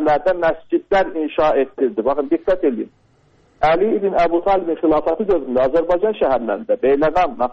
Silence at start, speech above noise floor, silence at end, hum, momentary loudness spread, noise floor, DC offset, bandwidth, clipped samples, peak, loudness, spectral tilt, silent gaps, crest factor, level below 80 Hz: 0 s; 38 dB; 0 s; none; 4 LU; -55 dBFS; under 0.1%; 7.4 kHz; under 0.1%; -4 dBFS; -18 LUFS; -7 dB/octave; none; 14 dB; -42 dBFS